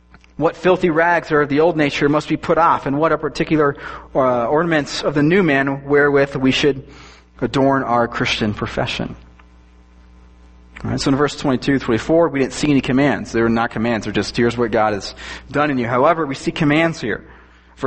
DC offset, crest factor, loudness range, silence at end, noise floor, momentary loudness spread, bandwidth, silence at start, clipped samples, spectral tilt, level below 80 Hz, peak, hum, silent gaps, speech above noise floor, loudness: under 0.1%; 16 dB; 5 LU; 0 s; -46 dBFS; 8 LU; 8.8 kHz; 0.4 s; under 0.1%; -6 dB/octave; -42 dBFS; -2 dBFS; none; none; 29 dB; -17 LUFS